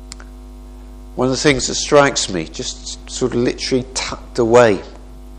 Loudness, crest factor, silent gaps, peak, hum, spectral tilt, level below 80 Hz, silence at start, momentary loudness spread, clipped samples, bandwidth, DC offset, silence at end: -16 LUFS; 18 dB; none; 0 dBFS; 50 Hz at -35 dBFS; -4 dB/octave; -36 dBFS; 0 s; 17 LU; under 0.1%; 11 kHz; under 0.1%; 0 s